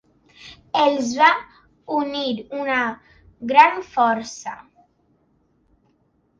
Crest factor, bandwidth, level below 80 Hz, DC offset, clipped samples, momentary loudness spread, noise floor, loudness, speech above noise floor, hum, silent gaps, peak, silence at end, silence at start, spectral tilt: 20 dB; 7.6 kHz; -62 dBFS; under 0.1%; under 0.1%; 19 LU; -64 dBFS; -19 LUFS; 44 dB; none; none; -2 dBFS; 1.85 s; 0.45 s; -3 dB/octave